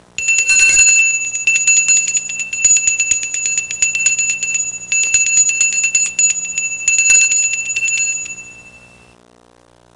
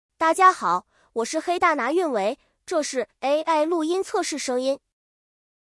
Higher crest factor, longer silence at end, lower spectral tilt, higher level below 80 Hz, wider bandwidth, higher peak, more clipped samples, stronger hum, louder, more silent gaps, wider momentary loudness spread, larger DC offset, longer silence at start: about the same, 16 dB vs 20 dB; first, 1.2 s vs 0.85 s; second, 3 dB/octave vs -2.5 dB/octave; first, -50 dBFS vs -68 dBFS; about the same, 11.5 kHz vs 12 kHz; first, 0 dBFS vs -4 dBFS; neither; first, 60 Hz at -50 dBFS vs none; first, -11 LUFS vs -23 LUFS; neither; about the same, 9 LU vs 11 LU; neither; about the same, 0.2 s vs 0.2 s